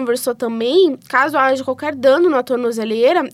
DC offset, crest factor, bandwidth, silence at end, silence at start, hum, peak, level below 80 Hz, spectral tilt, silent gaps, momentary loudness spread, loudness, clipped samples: under 0.1%; 14 dB; 16 kHz; 0.05 s; 0 s; none; -2 dBFS; -68 dBFS; -4 dB/octave; none; 6 LU; -16 LUFS; under 0.1%